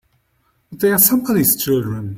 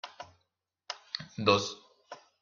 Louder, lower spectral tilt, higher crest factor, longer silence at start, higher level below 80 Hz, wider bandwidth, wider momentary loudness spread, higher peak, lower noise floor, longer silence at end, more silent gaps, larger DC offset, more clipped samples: first, -15 LUFS vs -30 LUFS; about the same, -4.5 dB/octave vs -4 dB/octave; second, 18 dB vs 24 dB; first, 0.7 s vs 0.05 s; first, -50 dBFS vs -72 dBFS; first, 16.5 kHz vs 7.4 kHz; second, 8 LU vs 24 LU; first, 0 dBFS vs -10 dBFS; second, -63 dBFS vs -81 dBFS; second, 0 s vs 0.25 s; neither; neither; neither